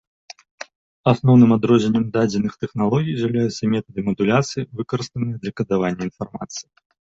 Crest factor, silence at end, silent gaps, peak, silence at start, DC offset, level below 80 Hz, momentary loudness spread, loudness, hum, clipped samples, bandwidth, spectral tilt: 18 dB; 0.45 s; 0.75-1.04 s; -2 dBFS; 0.6 s; under 0.1%; -54 dBFS; 17 LU; -20 LUFS; none; under 0.1%; 7.8 kHz; -7 dB/octave